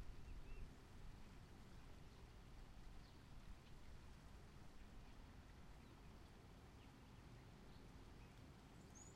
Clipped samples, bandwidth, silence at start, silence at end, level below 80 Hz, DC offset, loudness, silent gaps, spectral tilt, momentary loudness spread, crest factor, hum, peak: under 0.1%; 15 kHz; 0 s; 0 s; -62 dBFS; under 0.1%; -64 LUFS; none; -5 dB/octave; 3 LU; 16 dB; none; -44 dBFS